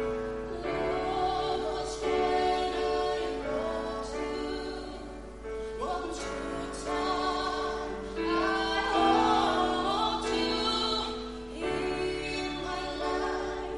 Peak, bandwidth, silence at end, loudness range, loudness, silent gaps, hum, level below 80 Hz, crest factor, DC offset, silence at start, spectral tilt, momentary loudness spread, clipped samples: -12 dBFS; 11.5 kHz; 0 s; 7 LU; -30 LUFS; none; none; -46 dBFS; 18 dB; under 0.1%; 0 s; -4 dB/octave; 9 LU; under 0.1%